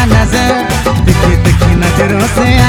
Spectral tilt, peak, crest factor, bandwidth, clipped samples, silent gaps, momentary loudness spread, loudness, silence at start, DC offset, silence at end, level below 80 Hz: -5.5 dB/octave; 0 dBFS; 8 dB; 19.5 kHz; 2%; none; 2 LU; -10 LUFS; 0 s; under 0.1%; 0 s; -16 dBFS